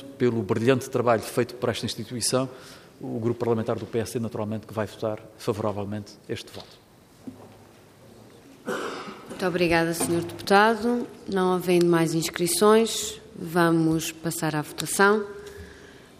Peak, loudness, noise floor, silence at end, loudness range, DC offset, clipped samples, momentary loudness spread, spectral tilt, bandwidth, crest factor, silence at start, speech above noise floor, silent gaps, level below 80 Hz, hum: -6 dBFS; -25 LUFS; -51 dBFS; 0.2 s; 13 LU; under 0.1%; under 0.1%; 18 LU; -4.5 dB/octave; 15.5 kHz; 20 dB; 0 s; 27 dB; none; -60 dBFS; none